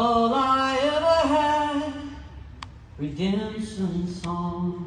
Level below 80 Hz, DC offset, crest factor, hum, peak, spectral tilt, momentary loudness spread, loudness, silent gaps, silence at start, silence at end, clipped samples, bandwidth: -46 dBFS; under 0.1%; 14 dB; none; -10 dBFS; -6 dB/octave; 21 LU; -24 LUFS; none; 0 s; 0 s; under 0.1%; 10 kHz